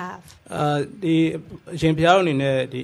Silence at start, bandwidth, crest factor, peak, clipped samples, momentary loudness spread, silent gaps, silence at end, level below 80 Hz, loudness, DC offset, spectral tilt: 0 s; 12.5 kHz; 18 dB; -4 dBFS; under 0.1%; 18 LU; none; 0 s; -50 dBFS; -20 LUFS; under 0.1%; -6.5 dB/octave